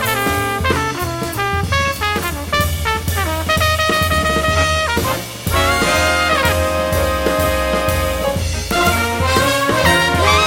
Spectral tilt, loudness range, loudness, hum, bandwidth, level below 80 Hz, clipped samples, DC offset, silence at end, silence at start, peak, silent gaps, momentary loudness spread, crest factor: -4 dB/octave; 3 LU; -16 LUFS; none; 17 kHz; -28 dBFS; under 0.1%; under 0.1%; 0 s; 0 s; 0 dBFS; none; 5 LU; 16 dB